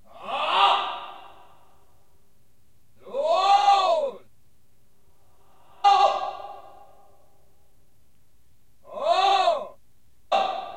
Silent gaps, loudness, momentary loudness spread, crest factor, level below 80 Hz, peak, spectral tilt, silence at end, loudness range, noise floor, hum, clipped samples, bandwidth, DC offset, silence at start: none; -22 LUFS; 23 LU; 20 dB; -70 dBFS; -6 dBFS; -1.5 dB/octave; 0 s; 4 LU; -65 dBFS; none; under 0.1%; 10.5 kHz; 0.4%; 0.15 s